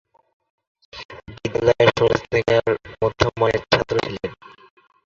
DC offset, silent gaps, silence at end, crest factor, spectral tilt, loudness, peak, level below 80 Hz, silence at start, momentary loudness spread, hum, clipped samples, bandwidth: under 0.1%; 1.05-1.09 s; 0.7 s; 20 dB; -5.5 dB/octave; -20 LUFS; 0 dBFS; -44 dBFS; 0.95 s; 21 LU; none; under 0.1%; 7.4 kHz